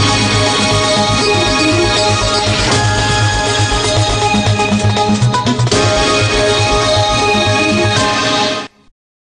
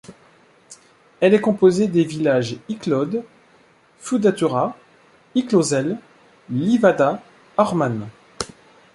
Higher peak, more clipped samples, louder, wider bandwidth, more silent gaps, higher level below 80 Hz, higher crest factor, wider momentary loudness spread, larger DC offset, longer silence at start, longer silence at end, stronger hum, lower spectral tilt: about the same, -2 dBFS vs -2 dBFS; neither; first, -12 LUFS vs -20 LUFS; about the same, 10.5 kHz vs 11.5 kHz; neither; first, -28 dBFS vs -60 dBFS; second, 10 dB vs 18 dB; second, 2 LU vs 15 LU; neither; about the same, 0 s vs 0.1 s; about the same, 0.55 s vs 0.5 s; neither; second, -4 dB/octave vs -6 dB/octave